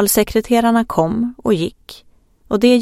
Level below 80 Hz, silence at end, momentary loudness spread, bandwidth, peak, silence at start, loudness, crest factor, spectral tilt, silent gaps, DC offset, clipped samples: -42 dBFS; 0 s; 6 LU; 16.5 kHz; 0 dBFS; 0 s; -17 LUFS; 16 dB; -4.5 dB/octave; none; under 0.1%; under 0.1%